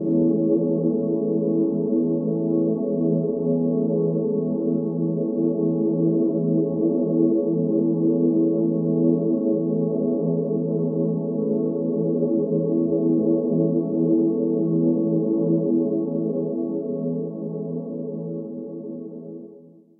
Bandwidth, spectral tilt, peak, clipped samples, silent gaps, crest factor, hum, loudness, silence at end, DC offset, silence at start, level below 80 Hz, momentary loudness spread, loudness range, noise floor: 1.4 kHz; -16.5 dB/octave; -8 dBFS; under 0.1%; none; 14 dB; none; -22 LUFS; 0.4 s; under 0.1%; 0 s; -72 dBFS; 9 LU; 4 LU; -47 dBFS